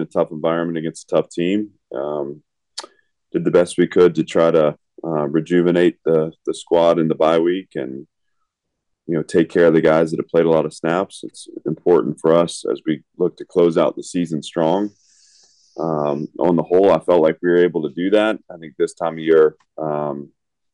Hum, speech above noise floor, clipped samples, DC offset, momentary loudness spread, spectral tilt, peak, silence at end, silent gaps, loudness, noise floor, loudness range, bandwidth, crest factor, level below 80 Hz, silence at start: none; 58 dB; under 0.1%; under 0.1%; 14 LU; -6.5 dB/octave; -4 dBFS; 0.5 s; none; -18 LUFS; -76 dBFS; 4 LU; 11 kHz; 14 dB; -60 dBFS; 0 s